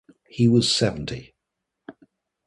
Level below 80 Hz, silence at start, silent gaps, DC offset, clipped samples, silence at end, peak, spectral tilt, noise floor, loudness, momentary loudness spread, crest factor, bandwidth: -52 dBFS; 0.35 s; none; under 0.1%; under 0.1%; 0.55 s; -6 dBFS; -5 dB/octave; -82 dBFS; -21 LUFS; 19 LU; 18 dB; 11.5 kHz